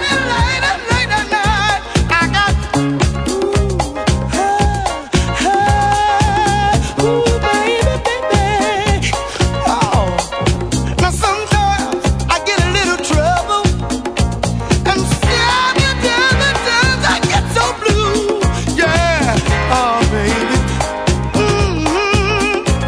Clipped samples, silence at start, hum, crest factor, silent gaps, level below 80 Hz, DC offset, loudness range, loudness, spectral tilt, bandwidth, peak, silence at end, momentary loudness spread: under 0.1%; 0 s; none; 14 dB; none; -22 dBFS; under 0.1%; 2 LU; -14 LUFS; -4.5 dB/octave; 11 kHz; 0 dBFS; 0 s; 5 LU